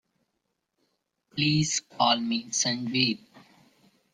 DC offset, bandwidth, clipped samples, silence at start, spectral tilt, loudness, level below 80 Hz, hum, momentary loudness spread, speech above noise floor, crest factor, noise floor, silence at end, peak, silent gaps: under 0.1%; 10.5 kHz; under 0.1%; 1.35 s; -3 dB/octave; -25 LUFS; -66 dBFS; none; 5 LU; 53 dB; 22 dB; -80 dBFS; 0.75 s; -8 dBFS; none